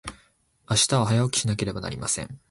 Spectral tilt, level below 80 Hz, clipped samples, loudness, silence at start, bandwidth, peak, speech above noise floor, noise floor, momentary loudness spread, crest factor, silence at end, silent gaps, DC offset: -4 dB/octave; -50 dBFS; under 0.1%; -24 LUFS; 0.05 s; 11.5 kHz; -8 dBFS; 38 dB; -63 dBFS; 9 LU; 18 dB; 0.15 s; none; under 0.1%